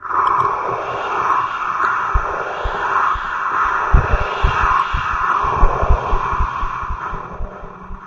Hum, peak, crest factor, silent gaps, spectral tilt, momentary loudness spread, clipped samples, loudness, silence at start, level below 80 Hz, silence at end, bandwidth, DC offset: none; 0 dBFS; 18 dB; none; -6 dB/octave; 10 LU; under 0.1%; -18 LUFS; 0 s; -22 dBFS; 0 s; 7.2 kHz; under 0.1%